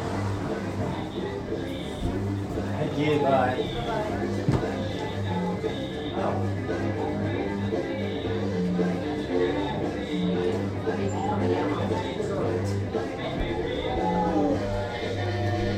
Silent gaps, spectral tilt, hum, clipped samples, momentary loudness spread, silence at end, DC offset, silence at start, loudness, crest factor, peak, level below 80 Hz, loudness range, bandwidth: none; -7 dB/octave; none; under 0.1%; 6 LU; 0 s; under 0.1%; 0 s; -28 LUFS; 16 dB; -10 dBFS; -44 dBFS; 2 LU; 11.5 kHz